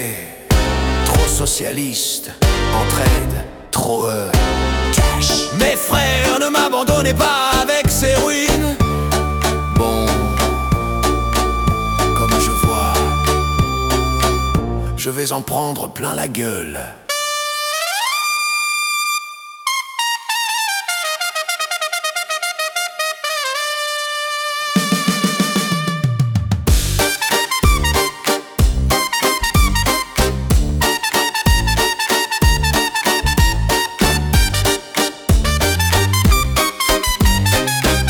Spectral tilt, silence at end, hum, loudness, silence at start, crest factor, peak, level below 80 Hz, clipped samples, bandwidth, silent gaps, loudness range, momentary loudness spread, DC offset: -3.5 dB/octave; 0 s; none; -16 LUFS; 0 s; 16 dB; 0 dBFS; -22 dBFS; under 0.1%; 19 kHz; none; 4 LU; 5 LU; under 0.1%